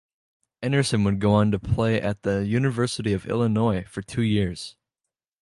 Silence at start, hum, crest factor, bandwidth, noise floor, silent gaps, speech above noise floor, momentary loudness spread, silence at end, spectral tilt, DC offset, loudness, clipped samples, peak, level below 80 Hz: 0.6 s; none; 18 dB; 11.5 kHz; -87 dBFS; none; 64 dB; 9 LU; 0.7 s; -6.5 dB/octave; under 0.1%; -24 LUFS; under 0.1%; -6 dBFS; -44 dBFS